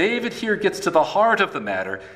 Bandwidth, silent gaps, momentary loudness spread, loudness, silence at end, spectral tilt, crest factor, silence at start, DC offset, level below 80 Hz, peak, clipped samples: 15.5 kHz; none; 8 LU; -21 LUFS; 0 s; -4 dB/octave; 16 dB; 0 s; under 0.1%; -60 dBFS; -4 dBFS; under 0.1%